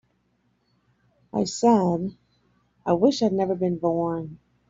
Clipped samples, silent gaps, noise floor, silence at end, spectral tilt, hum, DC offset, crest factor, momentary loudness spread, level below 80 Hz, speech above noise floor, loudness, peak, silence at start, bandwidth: under 0.1%; none; -69 dBFS; 0.35 s; -6.5 dB/octave; none; under 0.1%; 18 dB; 13 LU; -60 dBFS; 46 dB; -24 LUFS; -8 dBFS; 1.35 s; 7.8 kHz